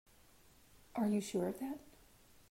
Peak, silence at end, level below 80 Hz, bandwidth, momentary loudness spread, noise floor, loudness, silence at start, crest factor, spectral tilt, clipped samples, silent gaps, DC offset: -26 dBFS; 0.6 s; -70 dBFS; 16 kHz; 11 LU; -65 dBFS; -39 LUFS; 0.95 s; 16 dB; -6 dB/octave; under 0.1%; none; under 0.1%